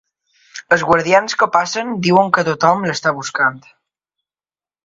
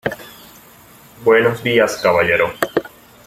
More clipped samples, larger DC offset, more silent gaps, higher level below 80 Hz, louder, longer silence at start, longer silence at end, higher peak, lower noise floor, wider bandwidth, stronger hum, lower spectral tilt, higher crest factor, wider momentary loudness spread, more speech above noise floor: neither; neither; neither; about the same, -56 dBFS vs -52 dBFS; about the same, -15 LUFS vs -16 LUFS; first, 0.55 s vs 0.05 s; first, 1.25 s vs 0.4 s; about the same, 0 dBFS vs 0 dBFS; first, under -90 dBFS vs -44 dBFS; second, 7.8 kHz vs 16 kHz; neither; about the same, -4.5 dB/octave vs -4.5 dB/octave; about the same, 18 dB vs 18 dB; second, 6 LU vs 12 LU; first, over 75 dB vs 30 dB